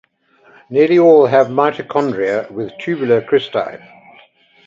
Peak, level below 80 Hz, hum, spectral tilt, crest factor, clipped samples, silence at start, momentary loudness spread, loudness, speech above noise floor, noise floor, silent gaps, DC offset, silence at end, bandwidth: 0 dBFS; -62 dBFS; none; -7.5 dB/octave; 16 dB; under 0.1%; 0.7 s; 13 LU; -14 LUFS; 37 dB; -51 dBFS; none; under 0.1%; 0.9 s; 7.4 kHz